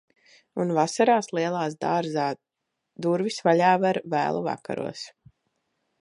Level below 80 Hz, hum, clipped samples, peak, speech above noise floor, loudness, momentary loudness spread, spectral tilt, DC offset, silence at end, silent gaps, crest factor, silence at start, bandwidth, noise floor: -72 dBFS; none; under 0.1%; -6 dBFS; 52 dB; -25 LUFS; 13 LU; -5.5 dB/octave; under 0.1%; 0.9 s; none; 20 dB; 0.55 s; 11 kHz; -76 dBFS